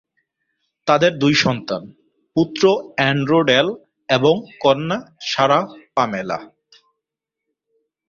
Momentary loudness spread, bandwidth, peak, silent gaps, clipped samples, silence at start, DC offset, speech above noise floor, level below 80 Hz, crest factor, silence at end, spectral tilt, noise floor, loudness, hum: 11 LU; 7.6 kHz; -2 dBFS; none; under 0.1%; 0.85 s; under 0.1%; 66 dB; -58 dBFS; 18 dB; 1.65 s; -5 dB/octave; -83 dBFS; -18 LUFS; none